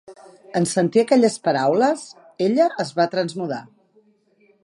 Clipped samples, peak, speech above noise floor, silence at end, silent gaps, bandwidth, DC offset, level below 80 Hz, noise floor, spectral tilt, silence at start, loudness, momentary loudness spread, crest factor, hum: under 0.1%; -4 dBFS; 40 dB; 1 s; none; 11 kHz; under 0.1%; -72 dBFS; -59 dBFS; -5.5 dB/octave; 0.1 s; -20 LUFS; 12 LU; 18 dB; none